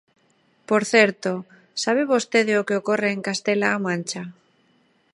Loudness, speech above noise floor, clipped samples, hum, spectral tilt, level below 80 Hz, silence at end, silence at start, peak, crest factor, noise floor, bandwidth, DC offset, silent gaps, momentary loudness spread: -21 LUFS; 41 dB; under 0.1%; none; -4 dB/octave; -74 dBFS; 0.8 s; 0.7 s; -2 dBFS; 22 dB; -63 dBFS; 11.5 kHz; under 0.1%; none; 14 LU